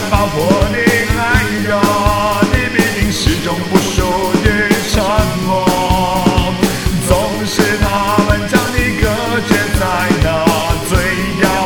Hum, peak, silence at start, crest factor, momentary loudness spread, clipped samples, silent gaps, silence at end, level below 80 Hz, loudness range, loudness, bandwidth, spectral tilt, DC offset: none; 0 dBFS; 0 s; 12 dB; 3 LU; under 0.1%; none; 0 s; -22 dBFS; 1 LU; -13 LUFS; over 20 kHz; -5 dB/octave; under 0.1%